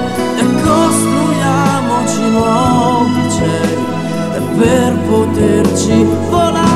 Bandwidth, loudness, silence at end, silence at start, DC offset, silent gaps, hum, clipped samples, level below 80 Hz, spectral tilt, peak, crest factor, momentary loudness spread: 15 kHz; -12 LUFS; 0 s; 0 s; 1%; none; none; under 0.1%; -38 dBFS; -5.5 dB/octave; 0 dBFS; 12 dB; 5 LU